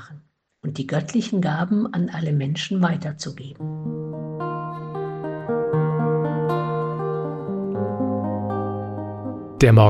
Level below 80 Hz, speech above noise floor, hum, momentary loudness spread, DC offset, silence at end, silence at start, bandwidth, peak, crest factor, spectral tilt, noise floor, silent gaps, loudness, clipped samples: -46 dBFS; 29 dB; none; 9 LU; under 0.1%; 0 s; 0 s; 10 kHz; -2 dBFS; 20 dB; -7.5 dB/octave; -49 dBFS; none; -25 LUFS; under 0.1%